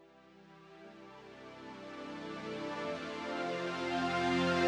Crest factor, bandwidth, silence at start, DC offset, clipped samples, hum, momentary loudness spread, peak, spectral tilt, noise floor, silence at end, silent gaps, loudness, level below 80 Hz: 18 dB; 11.5 kHz; 0 s; under 0.1%; under 0.1%; none; 22 LU; -18 dBFS; -5 dB/octave; -60 dBFS; 0 s; none; -37 LUFS; -70 dBFS